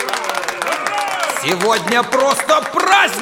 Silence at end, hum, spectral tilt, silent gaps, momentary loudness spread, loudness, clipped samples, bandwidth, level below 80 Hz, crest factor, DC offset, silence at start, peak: 0 s; none; -2 dB/octave; none; 7 LU; -16 LUFS; under 0.1%; 19 kHz; -60 dBFS; 16 dB; under 0.1%; 0 s; -2 dBFS